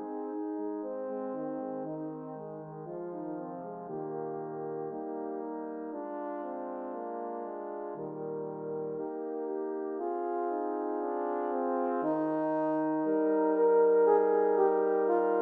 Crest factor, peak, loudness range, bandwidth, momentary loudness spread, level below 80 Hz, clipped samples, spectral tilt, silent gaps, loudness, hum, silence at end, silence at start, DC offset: 18 dB; -12 dBFS; 12 LU; 3 kHz; 13 LU; -84 dBFS; under 0.1%; -11 dB/octave; none; -32 LUFS; none; 0 s; 0 s; under 0.1%